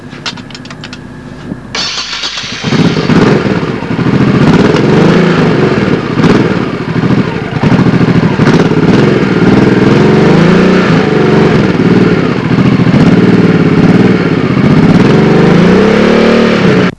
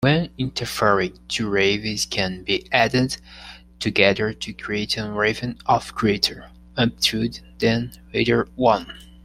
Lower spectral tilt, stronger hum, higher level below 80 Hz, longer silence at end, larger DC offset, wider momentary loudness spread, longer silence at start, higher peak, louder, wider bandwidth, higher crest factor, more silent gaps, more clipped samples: first, -7 dB/octave vs -4.5 dB/octave; neither; first, -32 dBFS vs -46 dBFS; about the same, 0.1 s vs 0.2 s; neither; about the same, 9 LU vs 10 LU; about the same, 0 s vs 0 s; about the same, 0 dBFS vs 0 dBFS; first, -7 LUFS vs -22 LUFS; second, 9.8 kHz vs 16 kHz; second, 6 dB vs 22 dB; neither; first, 3% vs under 0.1%